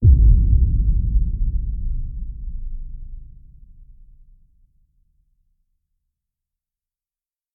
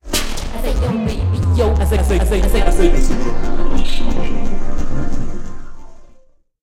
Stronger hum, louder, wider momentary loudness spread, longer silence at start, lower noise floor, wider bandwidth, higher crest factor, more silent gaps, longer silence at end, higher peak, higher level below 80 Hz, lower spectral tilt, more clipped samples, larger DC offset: neither; about the same, -21 LUFS vs -19 LUFS; first, 24 LU vs 10 LU; about the same, 0 s vs 0.05 s; first, under -90 dBFS vs -46 dBFS; second, 0.6 kHz vs 13.5 kHz; first, 18 dB vs 12 dB; neither; first, 4.25 s vs 0.55 s; about the same, -2 dBFS vs 0 dBFS; second, -22 dBFS vs -16 dBFS; first, -21.5 dB/octave vs -5.5 dB/octave; neither; neither